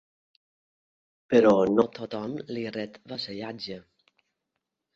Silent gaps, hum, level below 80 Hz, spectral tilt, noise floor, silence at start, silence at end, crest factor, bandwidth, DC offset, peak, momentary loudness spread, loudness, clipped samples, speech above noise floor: none; none; -66 dBFS; -6.5 dB/octave; -83 dBFS; 1.3 s; 1.15 s; 22 dB; 7.6 kHz; under 0.1%; -8 dBFS; 17 LU; -26 LUFS; under 0.1%; 58 dB